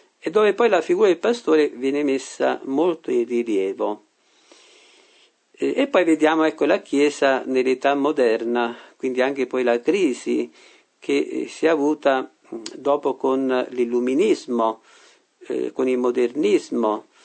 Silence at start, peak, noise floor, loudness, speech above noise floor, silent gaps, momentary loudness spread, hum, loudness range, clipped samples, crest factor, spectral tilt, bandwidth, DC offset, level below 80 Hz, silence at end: 0.25 s; -4 dBFS; -57 dBFS; -21 LUFS; 37 dB; none; 9 LU; none; 4 LU; under 0.1%; 18 dB; -4.5 dB/octave; 9 kHz; under 0.1%; -76 dBFS; 0.25 s